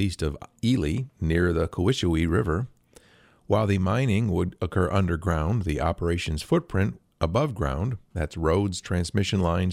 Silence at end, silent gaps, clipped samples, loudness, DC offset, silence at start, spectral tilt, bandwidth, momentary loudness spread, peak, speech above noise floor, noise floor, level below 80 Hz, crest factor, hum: 0 s; none; under 0.1%; -26 LUFS; under 0.1%; 0 s; -6.5 dB/octave; 13.5 kHz; 6 LU; -8 dBFS; 33 dB; -58 dBFS; -38 dBFS; 16 dB; none